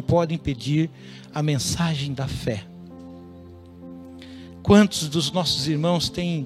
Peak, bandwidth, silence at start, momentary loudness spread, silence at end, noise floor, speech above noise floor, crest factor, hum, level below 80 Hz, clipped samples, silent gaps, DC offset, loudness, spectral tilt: -2 dBFS; 14.5 kHz; 0 s; 24 LU; 0 s; -43 dBFS; 21 dB; 22 dB; none; -46 dBFS; under 0.1%; none; under 0.1%; -23 LUFS; -5 dB/octave